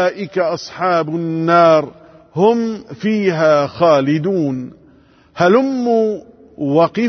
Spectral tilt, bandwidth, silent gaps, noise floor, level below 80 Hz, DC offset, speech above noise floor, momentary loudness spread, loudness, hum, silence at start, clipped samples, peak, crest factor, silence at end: -7 dB/octave; 6.4 kHz; none; -49 dBFS; -60 dBFS; under 0.1%; 34 dB; 11 LU; -15 LUFS; none; 0 s; under 0.1%; 0 dBFS; 14 dB; 0 s